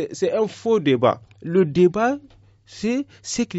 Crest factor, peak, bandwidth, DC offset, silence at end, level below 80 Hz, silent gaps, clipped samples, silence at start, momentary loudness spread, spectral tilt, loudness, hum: 16 dB; -4 dBFS; 8 kHz; under 0.1%; 0 s; -56 dBFS; none; under 0.1%; 0 s; 11 LU; -5.5 dB/octave; -21 LUFS; none